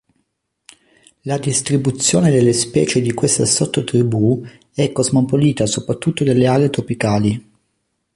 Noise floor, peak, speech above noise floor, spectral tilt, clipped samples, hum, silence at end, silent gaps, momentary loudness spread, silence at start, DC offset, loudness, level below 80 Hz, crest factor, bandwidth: -70 dBFS; -2 dBFS; 54 dB; -5 dB/octave; under 0.1%; none; 0.75 s; none; 7 LU; 1.25 s; under 0.1%; -16 LUFS; -48 dBFS; 16 dB; 11.5 kHz